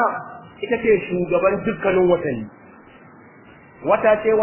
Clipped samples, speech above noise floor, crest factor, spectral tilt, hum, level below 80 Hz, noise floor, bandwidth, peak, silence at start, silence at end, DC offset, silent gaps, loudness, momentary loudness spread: under 0.1%; 28 dB; 16 dB; -10.5 dB/octave; none; -52 dBFS; -46 dBFS; 3.2 kHz; -4 dBFS; 0 s; 0 s; under 0.1%; none; -19 LUFS; 15 LU